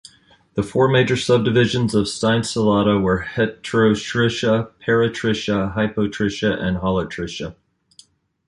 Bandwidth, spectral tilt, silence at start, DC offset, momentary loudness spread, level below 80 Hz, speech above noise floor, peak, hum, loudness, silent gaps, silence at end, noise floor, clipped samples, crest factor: 11.5 kHz; -5.5 dB/octave; 0.55 s; under 0.1%; 7 LU; -44 dBFS; 35 dB; -4 dBFS; none; -19 LUFS; none; 0.95 s; -54 dBFS; under 0.1%; 16 dB